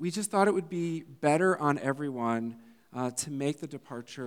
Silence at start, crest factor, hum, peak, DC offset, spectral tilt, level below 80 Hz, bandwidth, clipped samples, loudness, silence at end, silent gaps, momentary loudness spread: 0 s; 20 dB; none; -10 dBFS; under 0.1%; -5 dB/octave; -82 dBFS; 18.5 kHz; under 0.1%; -30 LUFS; 0 s; none; 14 LU